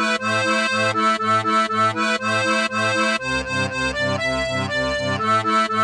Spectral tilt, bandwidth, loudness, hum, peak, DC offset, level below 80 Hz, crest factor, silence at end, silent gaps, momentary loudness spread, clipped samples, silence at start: -4 dB/octave; 10.5 kHz; -19 LUFS; none; -6 dBFS; under 0.1%; -46 dBFS; 14 dB; 0 s; none; 4 LU; under 0.1%; 0 s